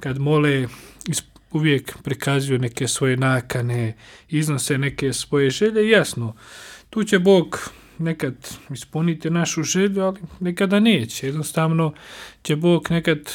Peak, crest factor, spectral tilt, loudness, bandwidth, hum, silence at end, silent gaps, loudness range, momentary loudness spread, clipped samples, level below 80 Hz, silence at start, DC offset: 0 dBFS; 20 dB; -5 dB/octave; -21 LUFS; 17.5 kHz; none; 0 s; none; 2 LU; 14 LU; under 0.1%; -52 dBFS; 0 s; under 0.1%